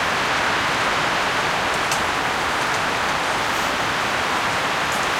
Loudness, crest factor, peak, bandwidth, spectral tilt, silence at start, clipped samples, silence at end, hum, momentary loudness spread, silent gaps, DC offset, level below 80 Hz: -20 LUFS; 16 dB; -6 dBFS; 17 kHz; -2 dB/octave; 0 s; under 0.1%; 0 s; none; 1 LU; none; under 0.1%; -46 dBFS